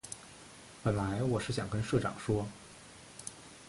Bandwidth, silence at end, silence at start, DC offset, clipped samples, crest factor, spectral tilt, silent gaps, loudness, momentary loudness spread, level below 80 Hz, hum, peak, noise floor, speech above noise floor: 11.5 kHz; 0 s; 0.05 s; under 0.1%; under 0.1%; 20 dB; -6 dB/octave; none; -35 LUFS; 18 LU; -56 dBFS; none; -16 dBFS; -53 dBFS; 20 dB